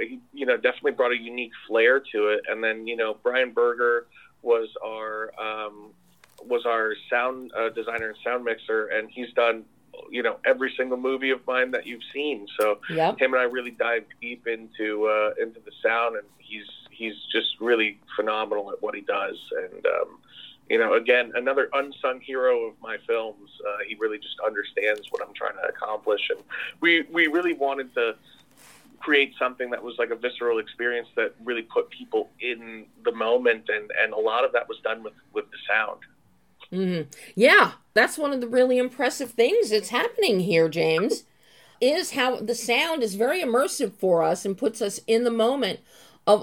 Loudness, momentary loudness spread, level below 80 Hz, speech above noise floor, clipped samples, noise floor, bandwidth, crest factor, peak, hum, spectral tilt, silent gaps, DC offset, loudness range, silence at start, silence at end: -25 LUFS; 12 LU; -74 dBFS; 33 dB; under 0.1%; -58 dBFS; 17 kHz; 20 dB; -4 dBFS; none; -3.5 dB/octave; none; under 0.1%; 6 LU; 0 s; 0 s